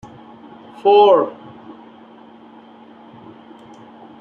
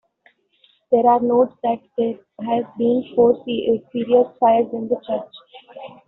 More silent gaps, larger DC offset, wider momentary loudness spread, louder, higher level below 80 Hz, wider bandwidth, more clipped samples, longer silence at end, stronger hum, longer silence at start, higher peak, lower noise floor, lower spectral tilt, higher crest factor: neither; neither; first, 29 LU vs 11 LU; first, -14 LUFS vs -19 LUFS; about the same, -66 dBFS vs -64 dBFS; about the same, 4.5 kHz vs 4.1 kHz; neither; first, 2.9 s vs 0.2 s; neither; about the same, 0.85 s vs 0.9 s; about the same, -2 dBFS vs -4 dBFS; second, -43 dBFS vs -59 dBFS; first, -6.5 dB/octave vs -5 dB/octave; about the same, 18 dB vs 16 dB